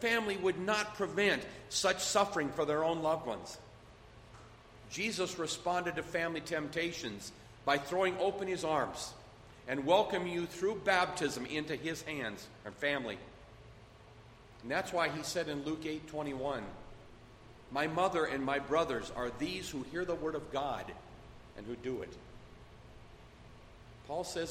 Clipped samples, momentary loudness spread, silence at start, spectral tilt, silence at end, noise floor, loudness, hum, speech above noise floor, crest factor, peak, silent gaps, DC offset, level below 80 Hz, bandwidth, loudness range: under 0.1%; 23 LU; 0 s; -3.5 dB/octave; 0 s; -56 dBFS; -35 LUFS; none; 21 dB; 22 dB; -14 dBFS; none; under 0.1%; -60 dBFS; 16 kHz; 7 LU